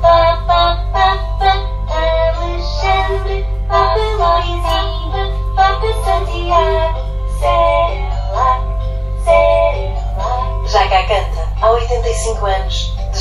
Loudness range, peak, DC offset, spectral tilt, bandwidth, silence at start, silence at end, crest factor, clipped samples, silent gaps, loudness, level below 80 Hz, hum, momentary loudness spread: 1 LU; 0 dBFS; under 0.1%; -5 dB/octave; 11.5 kHz; 0 s; 0 s; 14 dB; under 0.1%; none; -15 LUFS; -18 dBFS; none; 8 LU